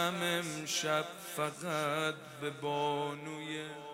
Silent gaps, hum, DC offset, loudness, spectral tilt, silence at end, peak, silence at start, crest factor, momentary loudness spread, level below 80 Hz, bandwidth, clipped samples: none; none; under 0.1%; -36 LUFS; -3.5 dB/octave; 0 s; -18 dBFS; 0 s; 18 dB; 9 LU; -78 dBFS; 16 kHz; under 0.1%